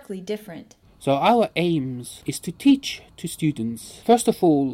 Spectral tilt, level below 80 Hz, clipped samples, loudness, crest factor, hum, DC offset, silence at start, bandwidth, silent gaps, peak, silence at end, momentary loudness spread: -5.5 dB/octave; -58 dBFS; under 0.1%; -22 LUFS; 18 dB; none; under 0.1%; 0.1 s; 16 kHz; none; -4 dBFS; 0 s; 14 LU